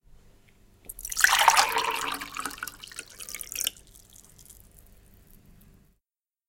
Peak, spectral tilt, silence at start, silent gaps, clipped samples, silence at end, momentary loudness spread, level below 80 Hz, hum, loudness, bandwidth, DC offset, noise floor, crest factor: -2 dBFS; 1 dB/octave; 0.9 s; none; under 0.1%; 1.95 s; 20 LU; -56 dBFS; none; -25 LUFS; 17 kHz; under 0.1%; -87 dBFS; 30 dB